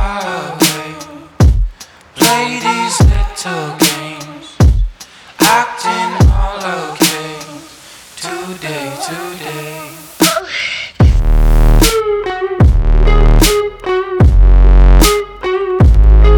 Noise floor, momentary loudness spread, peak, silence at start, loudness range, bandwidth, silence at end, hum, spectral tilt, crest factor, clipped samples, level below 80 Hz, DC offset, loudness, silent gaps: -37 dBFS; 16 LU; 0 dBFS; 0 s; 8 LU; over 20 kHz; 0 s; none; -4.5 dB/octave; 10 dB; under 0.1%; -12 dBFS; under 0.1%; -13 LUFS; none